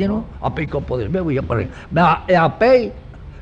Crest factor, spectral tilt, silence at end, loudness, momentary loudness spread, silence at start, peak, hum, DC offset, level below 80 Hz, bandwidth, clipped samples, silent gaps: 14 dB; -8.5 dB/octave; 0 s; -18 LUFS; 10 LU; 0 s; -4 dBFS; none; under 0.1%; -36 dBFS; 7.6 kHz; under 0.1%; none